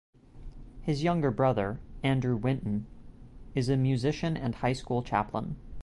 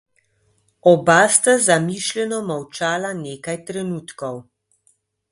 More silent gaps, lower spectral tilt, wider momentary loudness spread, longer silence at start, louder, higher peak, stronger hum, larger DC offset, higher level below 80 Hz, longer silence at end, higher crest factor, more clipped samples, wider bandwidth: neither; first, -7.5 dB/octave vs -3.5 dB/octave; second, 10 LU vs 16 LU; second, 0.35 s vs 0.85 s; second, -30 LUFS vs -18 LUFS; second, -14 dBFS vs 0 dBFS; neither; neither; first, -48 dBFS vs -62 dBFS; second, 0 s vs 0.9 s; about the same, 16 dB vs 20 dB; neither; about the same, 11.5 kHz vs 11.5 kHz